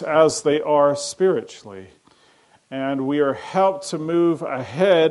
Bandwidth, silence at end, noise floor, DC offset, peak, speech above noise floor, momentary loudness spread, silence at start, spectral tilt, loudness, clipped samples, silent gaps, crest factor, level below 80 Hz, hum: 11.5 kHz; 0 s; -56 dBFS; under 0.1%; -2 dBFS; 37 dB; 16 LU; 0 s; -5 dB/octave; -20 LUFS; under 0.1%; none; 18 dB; -66 dBFS; none